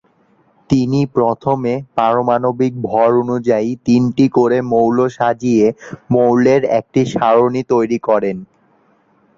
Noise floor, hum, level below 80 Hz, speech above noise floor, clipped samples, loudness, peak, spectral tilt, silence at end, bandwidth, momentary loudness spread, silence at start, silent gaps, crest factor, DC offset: -55 dBFS; none; -52 dBFS; 41 dB; under 0.1%; -15 LUFS; -2 dBFS; -7.5 dB/octave; 0.95 s; 7.6 kHz; 5 LU; 0.7 s; none; 14 dB; under 0.1%